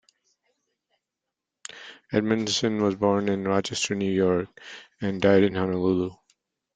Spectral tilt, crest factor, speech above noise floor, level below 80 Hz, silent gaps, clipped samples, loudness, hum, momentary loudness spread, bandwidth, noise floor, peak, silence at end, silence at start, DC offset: -5 dB/octave; 22 dB; 62 dB; -62 dBFS; none; under 0.1%; -24 LUFS; none; 20 LU; 9.4 kHz; -86 dBFS; -6 dBFS; 0.6 s; 1.7 s; under 0.1%